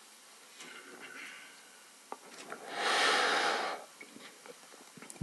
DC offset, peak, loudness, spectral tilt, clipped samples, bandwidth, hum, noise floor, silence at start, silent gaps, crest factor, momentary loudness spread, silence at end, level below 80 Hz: under 0.1%; -18 dBFS; -31 LUFS; 0 dB/octave; under 0.1%; 12 kHz; none; -57 dBFS; 0 s; none; 20 dB; 26 LU; 0 s; under -90 dBFS